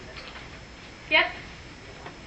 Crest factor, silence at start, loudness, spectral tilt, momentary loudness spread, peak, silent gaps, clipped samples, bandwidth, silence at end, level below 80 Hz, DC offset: 22 dB; 0 s; -23 LUFS; -3.5 dB/octave; 22 LU; -8 dBFS; none; under 0.1%; 8.4 kHz; 0 s; -52 dBFS; under 0.1%